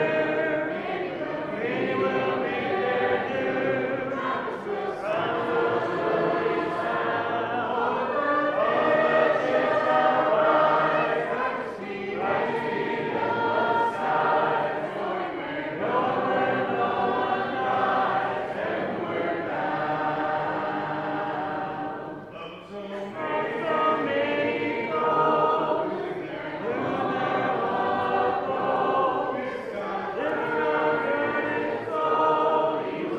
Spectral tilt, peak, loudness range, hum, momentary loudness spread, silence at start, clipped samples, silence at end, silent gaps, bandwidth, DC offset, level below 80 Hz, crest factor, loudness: -6.5 dB/octave; -8 dBFS; 5 LU; none; 9 LU; 0 s; under 0.1%; 0 s; none; 8.8 kHz; under 0.1%; -64 dBFS; 18 dB; -25 LUFS